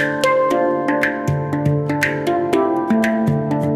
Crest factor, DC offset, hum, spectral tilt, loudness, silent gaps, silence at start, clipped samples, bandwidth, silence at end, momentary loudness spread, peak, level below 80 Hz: 14 dB; under 0.1%; none; -6.5 dB/octave; -18 LUFS; none; 0 s; under 0.1%; 16 kHz; 0 s; 3 LU; -2 dBFS; -50 dBFS